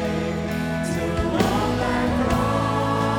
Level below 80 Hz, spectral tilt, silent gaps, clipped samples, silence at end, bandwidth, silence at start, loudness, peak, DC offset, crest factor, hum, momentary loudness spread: -36 dBFS; -6 dB/octave; none; under 0.1%; 0 s; 19.5 kHz; 0 s; -23 LUFS; -6 dBFS; under 0.1%; 16 dB; none; 4 LU